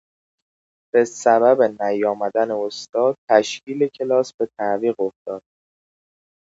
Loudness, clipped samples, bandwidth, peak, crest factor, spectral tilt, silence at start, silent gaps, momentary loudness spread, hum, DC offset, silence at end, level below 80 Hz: -20 LUFS; under 0.1%; 8 kHz; 0 dBFS; 20 dB; -4.5 dB/octave; 0.95 s; 2.89-2.93 s, 3.18-3.28 s, 4.34-4.39 s, 5.16-5.26 s; 10 LU; none; under 0.1%; 1.2 s; -74 dBFS